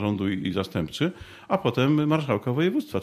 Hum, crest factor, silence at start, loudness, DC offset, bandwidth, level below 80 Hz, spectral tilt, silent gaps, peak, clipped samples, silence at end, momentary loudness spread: none; 16 dB; 0 s; -25 LUFS; under 0.1%; 15 kHz; -56 dBFS; -7 dB/octave; none; -8 dBFS; under 0.1%; 0 s; 7 LU